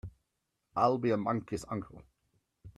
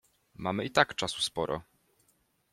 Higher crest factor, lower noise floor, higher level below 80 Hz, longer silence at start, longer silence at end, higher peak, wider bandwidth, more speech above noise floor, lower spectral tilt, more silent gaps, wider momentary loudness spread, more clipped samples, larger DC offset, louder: about the same, 22 dB vs 26 dB; first, -83 dBFS vs -72 dBFS; about the same, -62 dBFS vs -62 dBFS; second, 0.05 s vs 0.4 s; second, 0.05 s vs 0.9 s; second, -14 dBFS vs -8 dBFS; second, 13 kHz vs 16 kHz; first, 51 dB vs 41 dB; first, -7 dB/octave vs -3.5 dB/octave; neither; first, 17 LU vs 10 LU; neither; neither; about the same, -33 LUFS vs -31 LUFS